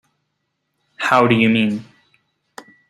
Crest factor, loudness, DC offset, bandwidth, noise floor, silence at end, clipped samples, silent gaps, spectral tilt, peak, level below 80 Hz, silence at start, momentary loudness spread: 18 dB; -16 LUFS; under 0.1%; 12 kHz; -73 dBFS; 1.05 s; under 0.1%; none; -6 dB/octave; -2 dBFS; -58 dBFS; 1 s; 10 LU